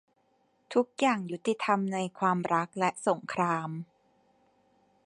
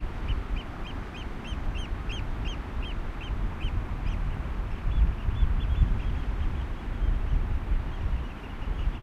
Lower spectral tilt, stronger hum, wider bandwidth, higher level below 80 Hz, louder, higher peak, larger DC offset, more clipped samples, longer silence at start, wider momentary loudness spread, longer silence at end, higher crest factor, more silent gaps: second, -5.5 dB/octave vs -7 dB/octave; neither; first, 11 kHz vs 6.8 kHz; second, -78 dBFS vs -28 dBFS; first, -30 LUFS vs -33 LUFS; about the same, -12 dBFS vs -10 dBFS; neither; neither; first, 0.7 s vs 0 s; about the same, 6 LU vs 8 LU; first, 1.2 s vs 0 s; about the same, 20 dB vs 18 dB; neither